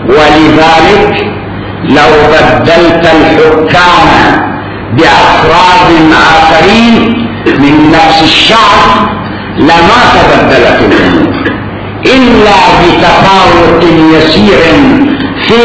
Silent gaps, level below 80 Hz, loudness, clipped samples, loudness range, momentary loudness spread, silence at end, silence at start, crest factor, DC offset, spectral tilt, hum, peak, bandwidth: none; -24 dBFS; -3 LUFS; 20%; 1 LU; 8 LU; 0 s; 0 s; 4 dB; under 0.1%; -5.5 dB/octave; none; 0 dBFS; 8 kHz